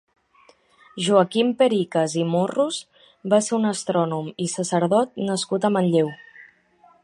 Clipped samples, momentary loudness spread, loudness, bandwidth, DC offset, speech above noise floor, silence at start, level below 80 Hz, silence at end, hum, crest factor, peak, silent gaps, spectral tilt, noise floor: under 0.1%; 8 LU; -22 LUFS; 11.5 kHz; under 0.1%; 36 dB; 0.95 s; -72 dBFS; 0.6 s; none; 20 dB; -2 dBFS; none; -5 dB/octave; -57 dBFS